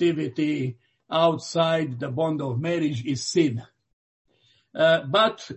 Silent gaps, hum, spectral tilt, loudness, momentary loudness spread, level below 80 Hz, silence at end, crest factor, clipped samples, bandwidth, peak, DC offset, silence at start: 3.93-4.25 s; none; -5.5 dB/octave; -24 LUFS; 8 LU; -66 dBFS; 0 s; 18 dB; under 0.1%; 8.4 kHz; -6 dBFS; under 0.1%; 0 s